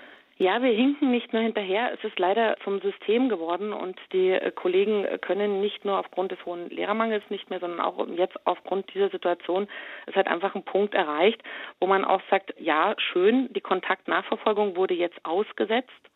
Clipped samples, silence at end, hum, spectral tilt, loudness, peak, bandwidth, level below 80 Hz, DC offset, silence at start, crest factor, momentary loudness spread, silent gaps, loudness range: under 0.1%; 0.2 s; none; -7.5 dB/octave; -26 LUFS; -6 dBFS; 4.1 kHz; -78 dBFS; under 0.1%; 0 s; 18 dB; 8 LU; none; 4 LU